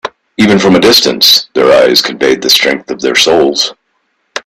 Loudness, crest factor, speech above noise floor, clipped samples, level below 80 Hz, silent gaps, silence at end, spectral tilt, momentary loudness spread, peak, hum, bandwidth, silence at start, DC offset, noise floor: -7 LUFS; 10 dB; 53 dB; 0.6%; -46 dBFS; none; 0.05 s; -3 dB/octave; 9 LU; 0 dBFS; none; over 20 kHz; 0.05 s; under 0.1%; -61 dBFS